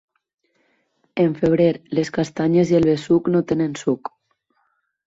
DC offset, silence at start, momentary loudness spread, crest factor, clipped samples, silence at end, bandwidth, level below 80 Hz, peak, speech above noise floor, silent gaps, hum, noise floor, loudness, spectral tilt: under 0.1%; 1.15 s; 8 LU; 16 dB; under 0.1%; 1 s; 7.8 kHz; -54 dBFS; -4 dBFS; 50 dB; none; none; -68 dBFS; -19 LUFS; -7.5 dB/octave